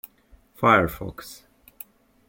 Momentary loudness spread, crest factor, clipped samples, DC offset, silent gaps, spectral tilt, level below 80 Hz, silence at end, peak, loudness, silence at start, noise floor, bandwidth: 25 LU; 22 dB; under 0.1%; under 0.1%; none; -6 dB/octave; -50 dBFS; 0.95 s; -4 dBFS; -20 LUFS; 0.6 s; -56 dBFS; 17 kHz